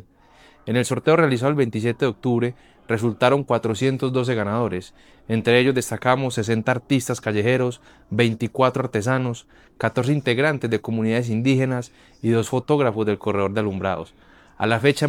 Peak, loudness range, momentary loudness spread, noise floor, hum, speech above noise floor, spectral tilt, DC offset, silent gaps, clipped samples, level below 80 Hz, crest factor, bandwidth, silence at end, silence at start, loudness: -4 dBFS; 2 LU; 8 LU; -52 dBFS; none; 31 dB; -6 dB/octave; under 0.1%; none; under 0.1%; -58 dBFS; 18 dB; 16.5 kHz; 0 s; 0.65 s; -22 LUFS